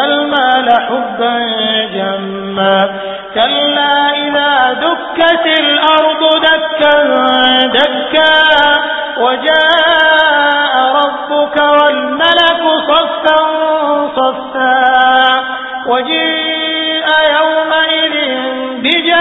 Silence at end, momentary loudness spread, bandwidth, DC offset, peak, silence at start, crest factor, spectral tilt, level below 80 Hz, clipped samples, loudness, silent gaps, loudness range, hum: 0 s; 7 LU; 8 kHz; under 0.1%; 0 dBFS; 0 s; 10 dB; -5 dB/octave; -50 dBFS; under 0.1%; -10 LUFS; none; 3 LU; none